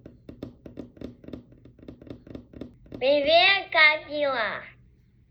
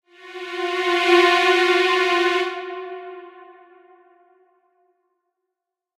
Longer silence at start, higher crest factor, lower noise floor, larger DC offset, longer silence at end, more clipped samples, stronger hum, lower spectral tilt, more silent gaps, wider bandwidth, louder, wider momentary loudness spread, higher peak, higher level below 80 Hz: about the same, 0.3 s vs 0.25 s; about the same, 20 dB vs 20 dB; second, -58 dBFS vs -83 dBFS; neither; second, 0.6 s vs 2.45 s; neither; neither; first, -5.5 dB/octave vs -1.5 dB/octave; neither; second, 6 kHz vs 13.5 kHz; second, -21 LUFS vs -18 LUFS; first, 27 LU vs 21 LU; about the same, -6 dBFS vs -4 dBFS; first, -56 dBFS vs -74 dBFS